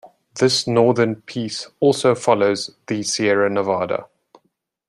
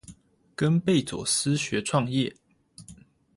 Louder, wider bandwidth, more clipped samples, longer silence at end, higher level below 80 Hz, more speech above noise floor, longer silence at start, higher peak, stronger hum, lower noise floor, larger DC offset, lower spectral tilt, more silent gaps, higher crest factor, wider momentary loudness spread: first, -19 LUFS vs -26 LUFS; about the same, 12.5 kHz vs 11.5 kHz; neither; first, 0.85 s vs 0.45 s; about the same, -64 dBFS vs -60 dBFS; first, 51 dB vs 27 dB; about the same, 0.05 s vs 0.1 s; first, -2 dBFS vs -10 dBFS; neither; first, -69 dBFS vs -52 dBFS; neither; about the same, -4.5 dB/octave vs -4.5 dB/octave; neither; about the same, 18 dB vs 16 dB; first, 10 LU vs 5 LU